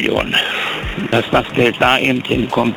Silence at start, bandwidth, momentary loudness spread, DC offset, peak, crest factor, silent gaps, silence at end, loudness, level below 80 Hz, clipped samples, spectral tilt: 0 s; 20 kHz; 6 LU; under 0.1%; 0 dBFS; 14 dB; none; 0 s; -15 LUFS; -36 dBFS; under 0.1%; -5 dB/octave